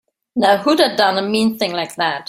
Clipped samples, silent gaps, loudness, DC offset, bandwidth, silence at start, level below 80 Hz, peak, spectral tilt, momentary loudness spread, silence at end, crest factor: under 0.1%; none; -16 LUFS; under 0.1%; 16 kHz; 0.35 s; -60 dBFS; 0 dBFS; -4 dB/octave; 7 LU; 0.05 s; 16 dB